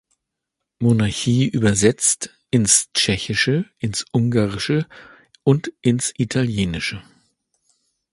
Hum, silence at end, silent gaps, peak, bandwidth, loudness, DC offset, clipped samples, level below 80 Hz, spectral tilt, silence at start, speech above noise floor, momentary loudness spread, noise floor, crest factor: none; 1.1 s; none; 0 dBFS; 11.5 kHz; -19 LUFS; under 0.1%; under 0.1%; -46 dBFS; -4 dB/octave; 0.8 s; 62 dB; 9 LU; -81 dBFS; 20 dB